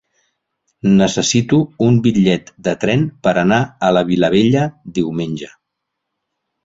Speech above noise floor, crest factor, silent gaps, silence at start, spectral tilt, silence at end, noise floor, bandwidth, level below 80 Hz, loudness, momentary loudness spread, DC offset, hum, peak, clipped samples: 62 dB; 14 dB; none; 0.85 s; -5.5 dB/octave; 1.2 s; -77 dBFS; 8 kHz; -48 dBFS; -15 LUFS; 9 LU; under 0.1%; none; -2 dBFS; under 0.1%